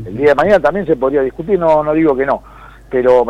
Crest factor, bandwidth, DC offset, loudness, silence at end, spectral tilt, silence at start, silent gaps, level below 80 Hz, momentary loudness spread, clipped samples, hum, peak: 12 dB; 9.6 kHz; under 0.1%; -13 LUFS; 0 s; -7.5 dB/octave; 0 s; none; -40 dBFS; 6 LU; under 0.1%; none; -2 dBFS